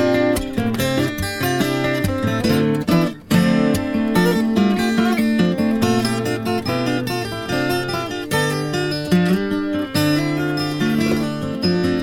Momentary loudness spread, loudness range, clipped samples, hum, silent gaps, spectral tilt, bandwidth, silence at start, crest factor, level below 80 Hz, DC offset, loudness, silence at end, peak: 5 LU; 3 LU; under 0.1%; none; none; -5.5 dB/octave; 18 kHz; 0 s; 16 dB; -42 dBFS; under 0.1%; -19 LUFS; 0 s; -4 dBFS